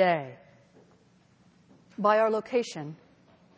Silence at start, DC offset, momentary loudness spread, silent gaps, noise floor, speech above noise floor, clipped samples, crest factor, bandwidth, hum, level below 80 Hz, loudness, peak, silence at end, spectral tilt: 0 s; under 0.1%; 22 LU; none; -62 dBFS; 36 dB; under 0.1%; 20 dB; 8 kHz; none; -76 dBFS; -27 LUFS; -10 dBFS; 0.65 s; -5.5 dB/octave